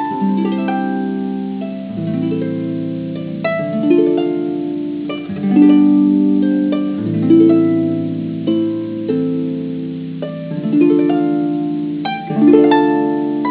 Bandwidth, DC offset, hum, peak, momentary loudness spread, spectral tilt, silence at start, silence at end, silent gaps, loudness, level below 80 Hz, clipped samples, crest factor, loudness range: 4 kHz; under 0.1%; none; 0 dBFS; 13 LU; -12 dB/octave; 0 s; 0 s; none; -16 LUFS; -60 dBFS; under 0.1%; 16 dB; 6 LU